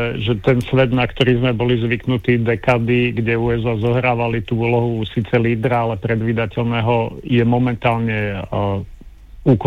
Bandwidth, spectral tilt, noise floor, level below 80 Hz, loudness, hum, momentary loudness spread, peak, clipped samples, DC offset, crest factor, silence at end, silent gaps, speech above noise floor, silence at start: 6.6 kHz; -8.5 dB/octave; -38 dBFS; -38 dBFS; -18 LUFS; none; 5 LU; -4 dBFS; under 0.1%; 0.3%; 14 dB; 0 s; none; 21 dB; 0 s